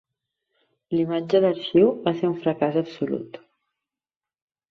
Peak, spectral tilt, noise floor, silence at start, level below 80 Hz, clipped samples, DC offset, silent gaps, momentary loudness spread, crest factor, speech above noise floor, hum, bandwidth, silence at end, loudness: -6 dBFS; -8.5 dB/octave; under -90 dBFS; 0.9 s; -66 dBFS; under 0.1%; under 0.1%; none; 10 LU; 20 dB; over 68 dB; none; 6.4 kHz; 1.35 s; -23 LUFS